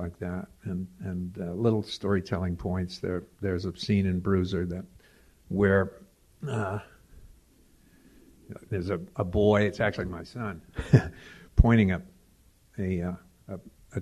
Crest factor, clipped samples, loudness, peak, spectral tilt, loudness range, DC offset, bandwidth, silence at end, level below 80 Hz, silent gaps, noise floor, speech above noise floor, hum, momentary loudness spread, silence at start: 26 dB; under 0.1%; -29 LUFS; -2 dBFS; -8 dB/octave; 6 LU; under 0.1%; 13 kHz; 0 s; -38 dBFS; none; -61 dBFS; 33 dB; none; 17 LU; 0 s